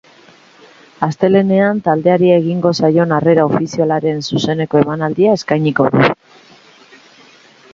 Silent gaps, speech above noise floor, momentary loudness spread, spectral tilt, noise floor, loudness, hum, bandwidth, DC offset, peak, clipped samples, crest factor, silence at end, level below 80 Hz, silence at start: none; 32 dB; 6 LU; -7 dB/octave; -45 dBFS; -14 LUFS; none; 7.6 kHz; under 0.1%; 0 dBFS; under 0.1%; 14 dB; 1.6 s; -54 dBFS; 1 s